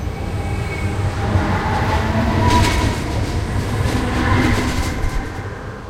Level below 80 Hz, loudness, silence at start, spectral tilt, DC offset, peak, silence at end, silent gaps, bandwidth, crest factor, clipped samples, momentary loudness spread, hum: -26 dBFS; -19 LUFS; 0 s; -5.5 dB/octave; under 0.1%; -2 dBFS; 0 s; none; 16 kHz; 16 dB; under 0.1%; 9 LU; none